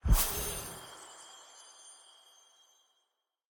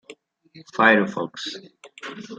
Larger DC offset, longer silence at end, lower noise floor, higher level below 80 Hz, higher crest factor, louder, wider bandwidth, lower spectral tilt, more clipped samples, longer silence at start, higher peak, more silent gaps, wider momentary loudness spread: neither; first, 1.6 s vs 0.05 s; first, -82 dBFS vs -49 dBFS; first, -38 dBFS vs -74 dBFS; about the same, 22 dB vs 22 dB; second, -34 LUFS vs -20 LUFS; first, over 20 kHz vs 9 kHz; second, -3.5 dB/octave vs -5 dB/octave; neither; about the same, 0.05 s vs 0.1 s; second, -14 dBFS vs -2 dBFS; neither; first, 26 LU vs 21 LU